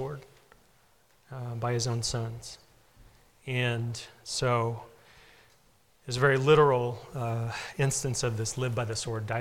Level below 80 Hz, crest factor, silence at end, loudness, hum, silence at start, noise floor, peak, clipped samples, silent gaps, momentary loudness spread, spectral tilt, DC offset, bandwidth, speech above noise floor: -56 dBFS; 20 dB; 0 s; -29 LUFS; none; 0 s; -65 dBFS; -10 dBFS; under 0.1%; none; 20 LU; -4.5 dB/octave; under 0.1%; 16 kHz; 36 dB